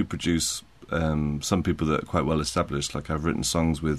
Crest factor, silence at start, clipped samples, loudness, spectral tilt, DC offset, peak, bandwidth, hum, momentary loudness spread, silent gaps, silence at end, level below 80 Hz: 18 dB; 0 s; under 0.1%; -26 LUFS; -5 dB/octave; 0.1%; -8 dBFS; 13.5 kHz; none; 4 LU; none; 0 s; -40 dBFS